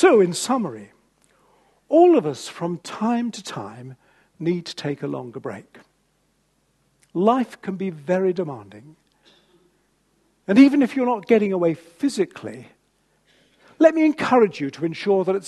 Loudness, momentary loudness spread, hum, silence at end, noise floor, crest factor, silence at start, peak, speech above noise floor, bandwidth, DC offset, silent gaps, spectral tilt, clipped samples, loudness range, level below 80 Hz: -21 LUFS; 19 LU; none; 0 s; -66 dBFS; 20 dB; 0 s; -2 dBFS; 46 dB; 12.5 kHz; under 0.1%; none; -6 dB/octave; under 0.1%; 9 LU; -70 dBFS